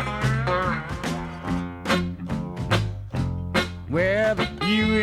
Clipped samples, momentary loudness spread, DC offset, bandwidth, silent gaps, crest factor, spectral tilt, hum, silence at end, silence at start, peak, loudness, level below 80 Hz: under 0.1%; 8 LU; under 0.1%; 15 kHz; none; 16 dB; -6 dB/octave; none; 0 s; 0 s; -8 dBFS; -25 LUFS; -40 dBFS